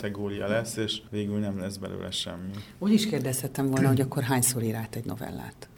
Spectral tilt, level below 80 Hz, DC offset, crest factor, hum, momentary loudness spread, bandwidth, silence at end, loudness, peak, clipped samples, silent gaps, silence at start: -5 dB/octave; -58 dBFS; under 0.1%; 20 dB; none; 12 LU; 18.5 kHz; 0.05 s; -28 LUFS; -8 dBFS; under 0.1%; none; 0 s